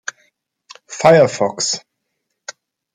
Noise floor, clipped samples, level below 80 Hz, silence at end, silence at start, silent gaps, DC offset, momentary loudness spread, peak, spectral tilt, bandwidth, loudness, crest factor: -74 dBFS; under 0.1%; -64 dBFS; 0.45 s; 0.9 s; none; under 0.1%; 24 LU; 0 dBFS; -4 dB/octave; 10.5 kHz; -15 LUFS; 18 dB